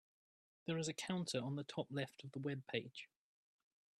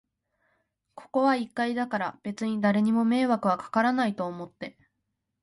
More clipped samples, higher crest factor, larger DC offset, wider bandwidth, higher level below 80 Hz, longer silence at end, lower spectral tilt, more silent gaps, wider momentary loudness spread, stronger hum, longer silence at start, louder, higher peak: neither; about the same, 20 dB vs 18 dB; neither; first, 13 kHz vs 11.5 kHz; second, -84 dBFS vs -72 dBFS; first, 0.95 s vs 0.75 s; second, -5 dB/octave vs -6.5 dB/octave; neither; about the same, 11 LU vs 12 LU; neither; second, 0.65 s vs 0.95 s; second, -44 LUFS vs -26 LUFS; second, -26 dBFS vs -10 dBFS